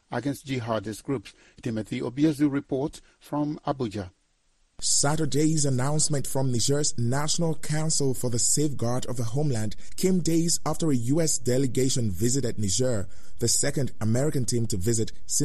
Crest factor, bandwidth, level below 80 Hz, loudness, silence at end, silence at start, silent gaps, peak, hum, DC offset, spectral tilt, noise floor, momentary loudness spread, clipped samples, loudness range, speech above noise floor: 16 dB; 13.5 kHz; -50 dBFS; -26 LUFS; 0 s; 0 s; none; -10 dBFS; none; under 0.1%; -4.5 dB/octave; -66 dBFS; 8 LU; under 0.1%; 4 LU; 41 dB